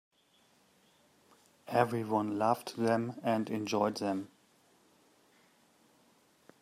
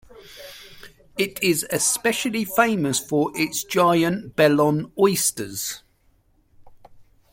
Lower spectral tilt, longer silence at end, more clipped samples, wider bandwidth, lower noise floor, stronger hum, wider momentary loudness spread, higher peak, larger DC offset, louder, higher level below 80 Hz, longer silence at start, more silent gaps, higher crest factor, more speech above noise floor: first, -6 dB/octave vs -3.5 dB/octave; first, 2.35 s vs 0.3 s; neither; about the same, 15 kHz vs 16.5 kHz; first, -69 dBFS vs -61 dBFS; neither; second, 6 LU vs 18 LU; second, -12 dBFS vs -4 dBFS; neither; second, -33 LUFS vs -21 LUFS; second, -80 dBFS vs -58 dBFS; first, 1.65 s vs 0.2 s; neither; about the same, 24 dB vs 20 dB; about the same, 37 dB vs 40 dB